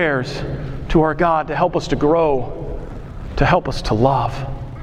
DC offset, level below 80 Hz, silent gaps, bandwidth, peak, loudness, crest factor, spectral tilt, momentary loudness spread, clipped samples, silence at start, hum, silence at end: under 0.1%; -30 dBFS; none; 11.5 kHz; -2 dBFS; -18 LUFS; 18 dB; -7 dB/octave; 14 LU; under 0.1%; 0 s; none; 0 s